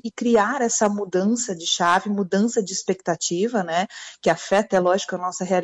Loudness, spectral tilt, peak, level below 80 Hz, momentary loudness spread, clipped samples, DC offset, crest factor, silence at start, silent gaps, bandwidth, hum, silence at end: -22 LUFS; -3.5 dB/octave; -8 dBFS; -64 dBFS; 6 LU; under 0.1%; under 0.1%; 14 dB; 0.05 s; none; 10.5 kHz; none; 0 s